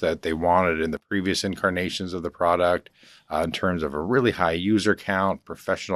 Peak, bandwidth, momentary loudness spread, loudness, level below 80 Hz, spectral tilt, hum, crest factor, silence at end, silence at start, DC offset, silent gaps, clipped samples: -4 dBFS; 13.5 kHz; 8 LU; -24 LUFS; -52 dBFS; -5 dB/octave; none; 20 dB; 0 s; 0 s; under 0.1%; none; under 0.1%